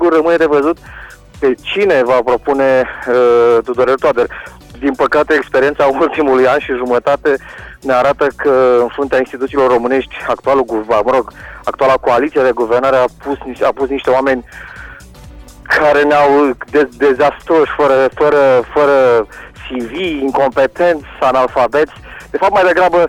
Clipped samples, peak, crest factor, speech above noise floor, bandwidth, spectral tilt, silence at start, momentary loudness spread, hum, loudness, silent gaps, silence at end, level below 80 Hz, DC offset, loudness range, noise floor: under 0.1%; -2 dBFS; 10 dB; 23 dB; 13 kHz; -5.5 dB/octave; 0 s; 12 LU; none; -12 LUFS; none; 0 s; -40 dBFS; under 0.1%; 3 LU; -35 dBFS